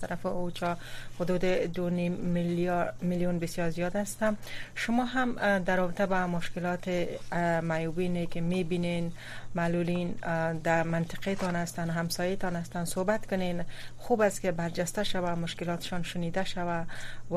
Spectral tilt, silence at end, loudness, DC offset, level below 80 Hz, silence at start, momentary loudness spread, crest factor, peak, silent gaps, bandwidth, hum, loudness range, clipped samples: -5.5 dB/octave; 0 s; -31 LUFS; under 0.1%; -46 dBFS; 0 s; 6 LU; 16 dB; -14 dBFS; none; 15 kHz; none; 2 LU; under 0.1%